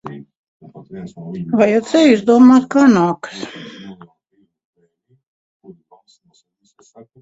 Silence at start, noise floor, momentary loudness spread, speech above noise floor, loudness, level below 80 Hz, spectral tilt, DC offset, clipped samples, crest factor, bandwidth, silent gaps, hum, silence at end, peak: 0.05 s; -62 dBFS; 25 LU; 49 dB; -12 LUFS; -60 dBFS; -6 dB/octave; under 0.1%; under 0.1%; 18 dB; 8 kHz; 0.37-0.60 s; none; 3.3 s; 0 dBFS